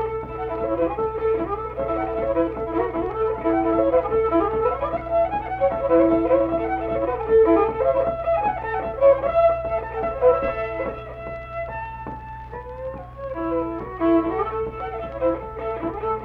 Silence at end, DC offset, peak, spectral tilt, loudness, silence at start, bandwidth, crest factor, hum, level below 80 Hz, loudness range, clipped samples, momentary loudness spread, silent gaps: 0 s; under 0.1%; -6 dBFS; -9.5 dB/octave; -22 LUFS; 0 s; 4.7 kHz; 16 dB; none; -40 dBFS; 6 LU; under 0.1%; 14 LU; none